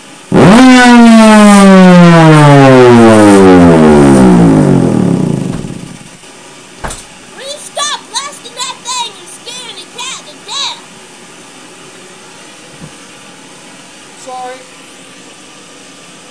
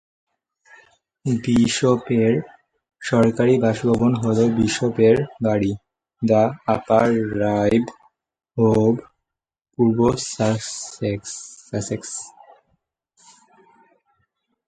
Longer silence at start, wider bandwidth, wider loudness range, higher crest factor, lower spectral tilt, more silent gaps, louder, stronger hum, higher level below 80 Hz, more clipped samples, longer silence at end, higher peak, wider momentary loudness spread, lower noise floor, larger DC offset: second, 0.3 s vs 1.25 s; first, 11 kHz vs 9.4 kHz; first, 26 LU vs 10 LU; second, 8 dB vs 18 dB; about the same, -6 dB/octave vs -6 dB/octave; neither; first, -4 LUFS vs -20 LUFS; neither; first, -34 dBFS vs -50 dBFS; first, 7% vs under 0.1%; second, 1.75 s vs 2.4 s; about the same, 0 dBFS vs -2 dBFS; first, 22 LU vs 13 LU; second, -33 dBFS vs -87 dBFS; neither